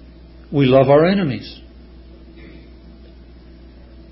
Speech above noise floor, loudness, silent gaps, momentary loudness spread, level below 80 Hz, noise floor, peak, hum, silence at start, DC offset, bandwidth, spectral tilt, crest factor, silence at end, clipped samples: 27 dB; -15 LUFS; none; 22 LU; -42 dBFS; -41 dBFS; 0 dBFS; 60 Hz at -45 dBFS; 0.5 s; under 0.1%; 5.8 kHz; -12 dB/octave; 18 dB; 2.6 s; under 0.1%